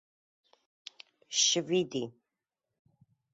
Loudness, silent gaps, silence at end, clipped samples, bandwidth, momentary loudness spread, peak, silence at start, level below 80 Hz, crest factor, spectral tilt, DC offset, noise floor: -29 LUFS; none; 1.25 s; under 0.1%; 8 kHz; 24 LU; -14 dBFS; 1.3 s; -80 dBFS; 22 dB; -2 dB/octave; under 0.1%; -89 dBFS